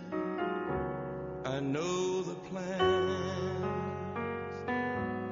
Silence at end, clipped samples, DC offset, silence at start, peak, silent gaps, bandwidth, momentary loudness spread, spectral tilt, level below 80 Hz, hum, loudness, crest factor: 0 s; under 0.1%; under 0.1%; 0 s; -16 dBFS; none; 7.2 kHz; 8 LU; -5 dB/octave; -58 dBFS; none; -34 LUFS; 18 dB